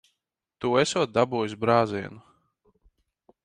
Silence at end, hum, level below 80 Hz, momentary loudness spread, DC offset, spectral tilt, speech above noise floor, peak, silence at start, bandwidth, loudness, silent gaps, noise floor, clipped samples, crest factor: 1.25 s; none; -64 dBFS; 10 LU; under 0.1%; -5 dB/octave; 57 dB; -6 dBFS; 0.6 s; 10.5 kHz; -25 LUFS; none; -82 dBFS; under 0.1%; 22 dB